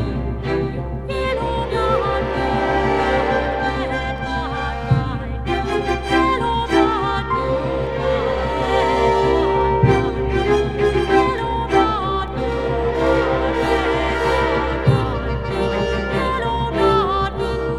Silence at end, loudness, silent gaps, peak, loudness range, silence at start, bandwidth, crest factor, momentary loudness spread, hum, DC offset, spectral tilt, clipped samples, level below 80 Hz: 0 s; -19 LUFS; none; -2 dBFS; 3 LU; 0 s; 11.5 kHz; 16 dB; 6 LU; none; under 0.1%; -6.5 dB/octave; under 0.1%; -30 dBFS